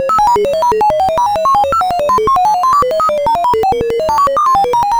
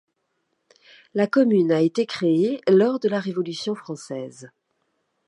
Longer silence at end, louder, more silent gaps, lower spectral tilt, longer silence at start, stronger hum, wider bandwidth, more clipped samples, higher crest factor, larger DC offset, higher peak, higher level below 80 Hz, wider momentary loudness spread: second, 0 s vs 0.8 s; first, -12 LUFS vs -21 LUFS; neither; second, -4 dB/octave vs -6.5 dB/octave; second, 0 s vs 1.15 s; neither; first, over 20 kHz vs 11 kHz; neither; second, 10 dB vs 16 dB; neither; first, 0 dBFS vs -6 dBFS; first, -36 dBFS vs -76 dBFS; second, 2 LU vs 14 LU